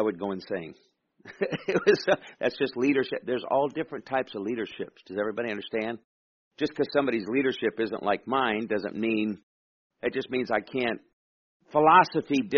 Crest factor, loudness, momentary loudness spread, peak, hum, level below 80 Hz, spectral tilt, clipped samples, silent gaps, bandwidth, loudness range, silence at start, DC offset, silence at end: 20 dB; -27 LUFS; 11 LU; -6 dBFS; none; -68 dBFS; -3.5 dB/octave; under 0.1%; 6.04-6.51 s, 9.43-9.90 s, 11.13-11.60 s; 6.8 kHz; 5 LU; 0 s; under 0.1%; 0 s